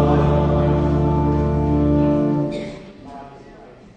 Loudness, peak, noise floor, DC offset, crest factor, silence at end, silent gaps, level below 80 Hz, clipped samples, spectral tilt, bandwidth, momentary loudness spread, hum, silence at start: -18 LUFS; -6 dBFS; -42 dBFS; under 0.1%; 14 dB; 0.3 s; none; -28 dBFS; under 0.1%; -9.5 dB/octave; 7 kHz; 21 LU; none; 0 s